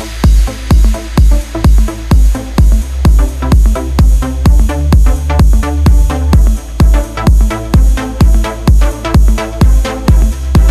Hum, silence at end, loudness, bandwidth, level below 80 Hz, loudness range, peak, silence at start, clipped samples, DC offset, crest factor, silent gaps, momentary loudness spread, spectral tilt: none; 0 s; -11 LUFS; 14 kHz; -8 dBFS; 1 LU; 0 dBFS; 0 s; 0.5%; under 0.1%; 8 dB; none; 2 LU; -6.5 dB/octave